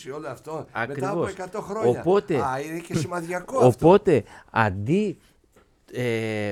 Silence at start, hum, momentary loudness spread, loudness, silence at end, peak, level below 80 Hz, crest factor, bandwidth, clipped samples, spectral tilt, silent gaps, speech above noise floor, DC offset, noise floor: 0 s; none; 16 LU; -23 LUFS; 0 s; -4 dBFS; -54 dBFS; 20 dB; 14.5 kHz; under 0.1%; -7 dB/octave; none; 36 dB; under 0.1%; -59 dBFS